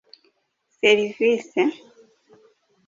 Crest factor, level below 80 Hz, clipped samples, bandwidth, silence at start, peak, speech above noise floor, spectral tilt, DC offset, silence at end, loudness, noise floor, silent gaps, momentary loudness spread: 20 dB; -70 dBFS; under 0.1%; 7.6 kHz; 0.85 s; -4 dBFS; 50 dB; -4 dB/octave; under 0.1%; 1.1 s; -21 LUFS; -70 dBFS; none; 5 LU